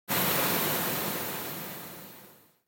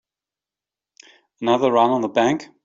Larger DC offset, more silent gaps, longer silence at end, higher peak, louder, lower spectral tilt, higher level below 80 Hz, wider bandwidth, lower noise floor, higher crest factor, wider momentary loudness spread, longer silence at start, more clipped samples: neither; neither; first, 0.35 s vs 0.2 s; second, -14 dBFS vs -4 dBFS; second, -28 LUFS vs -19 LUFS; second, -2.5 dB/octave vs -5.5 dB/octave; about the same, -64 dBFS vs -66 dBFS; first, 17 kHz vs 7.8 kHz; second, -55 dBFS vs -89 dBFS; about the same, 18 dB vs 18 dB; first, 18 LU vs 5 LU; second, 0.1 s vs 1.4 s; neither